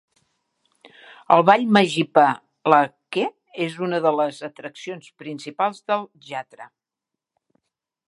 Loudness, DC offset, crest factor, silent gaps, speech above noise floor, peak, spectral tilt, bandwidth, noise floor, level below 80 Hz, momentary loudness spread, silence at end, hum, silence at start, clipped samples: -20 LUFS; under 0.1%; 22 dB; none; 65 dB; 0 dBFS; -5.5 dB/octave; 11.5 kHz; -86 dBFS; -74 dBFS; 19 LU; 1.45 s; none; 1.3 s; under 0.1%